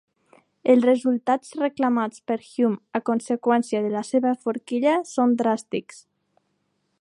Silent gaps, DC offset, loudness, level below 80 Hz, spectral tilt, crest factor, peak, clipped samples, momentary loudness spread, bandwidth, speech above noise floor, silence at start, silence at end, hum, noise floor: none; under 0.1%; -23 LUFS; -76 dBFS; -5.5 dB/octave; 18 dB; -6 dBFS; under 0.1%; 8 LU; 11 kHz; 50 dB; 0.65 s; 1.2 s; none; -72 dBFS